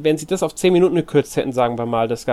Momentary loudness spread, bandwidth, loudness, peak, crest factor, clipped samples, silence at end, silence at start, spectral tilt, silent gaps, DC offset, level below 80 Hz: 6 LU; 14 kHz; -18 LUFS; -4 dBFS; 14 dB; under 0.1%; 0 s; 0 s; -6 dB/octave; none; under 0.1%; -50 dBFS